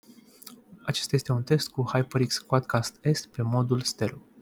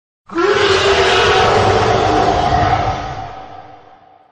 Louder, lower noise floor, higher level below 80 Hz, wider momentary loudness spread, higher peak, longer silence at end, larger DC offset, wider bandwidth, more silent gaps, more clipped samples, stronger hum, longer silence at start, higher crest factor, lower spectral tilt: second, -27 LUFS vs -13 LUFS; first, -50 dBFS vs -44 dBFS; second, -62 dBFS vs -32 dBFS; about the same, 13 LU vs 15 LU; second, -8 dBFS vs 0 dBFS; second, 0.2 s vs 0.55 s; neither; first, 18.5 kHz vs 10.5 kHz; neither; neither; neither; first, 0.45 s vs 0.3 s; first, 20 dB vs 14 dB; about the same, -5.5 dB/octave vs -4.5 dB/octave